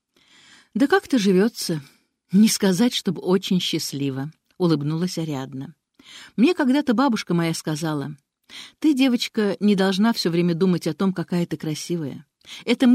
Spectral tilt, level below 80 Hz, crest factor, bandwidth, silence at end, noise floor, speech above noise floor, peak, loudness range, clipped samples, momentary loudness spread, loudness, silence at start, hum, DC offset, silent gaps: -5.5 dB/octave; -66 dBFS; 16 dB; 16 kHz; 0 s; -55 dBFS; 34 dB; -4 dBFS; 3 LU; under 0.1%; 15 LU; -22 LUFS; 0.75 s; none; under 0.1%; none